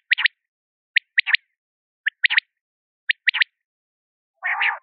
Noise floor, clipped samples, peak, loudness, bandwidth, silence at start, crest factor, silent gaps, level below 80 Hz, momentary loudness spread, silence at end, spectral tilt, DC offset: under -90 dBFS; under 0.1%; -4 dBFS; -21 LUFS; 5.2 kHz; 0.1 s; 20 dB; 0.48-0.94 s, 1.58-2.04 s, 2.61-3.07 s, 3.65-4.34 s; under -90 dBFS; 9 LU; 0.05 s; 16 dB/octave; under 0.1%